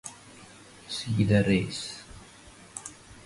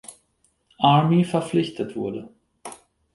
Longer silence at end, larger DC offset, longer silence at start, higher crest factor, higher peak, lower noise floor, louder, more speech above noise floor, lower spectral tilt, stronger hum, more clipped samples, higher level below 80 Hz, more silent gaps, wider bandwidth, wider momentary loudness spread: second, 0.05 s vs 0.4 s; neither; about the same, 0.05 s vs 0.1 s; about the same, 22 dB vs 20 dB; second, -10 dBFS vs -4 dBFS; second, -51 dBFS vs -67 dBFS; second, -27 LUFS vs -21 LUFS; second, 26 dB vs 47 dB; about the same, -5.5 dB/octave vs -6.5 dB/octave; neither; neither; first, -52 dBFS vs -62 dBFS; neither; about the same, 11.5 kHz vs 11.5 kHz; about the same, 25 LU vs 23 LU